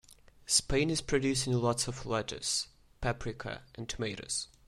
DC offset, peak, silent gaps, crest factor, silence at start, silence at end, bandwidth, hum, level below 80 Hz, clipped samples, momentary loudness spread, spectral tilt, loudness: under 0.1%; -12 dBFS; none; 22 dB; 0.1 s; 0.25 s; 16 kHz; none; -50 dBFS; under 0.1%; 13 LU; -3.5 dB/octave; -32 LUFS